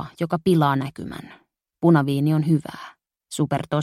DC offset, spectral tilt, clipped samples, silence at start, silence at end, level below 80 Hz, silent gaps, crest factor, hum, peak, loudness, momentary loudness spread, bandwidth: under 0.1%; -7.5 dB/octave; under 0.1%; 0 s; 0 s; -58 dBFS; none; 18 dB; none; -4 dBFS; -21 LUFS; 19 LU; 13.5 kHz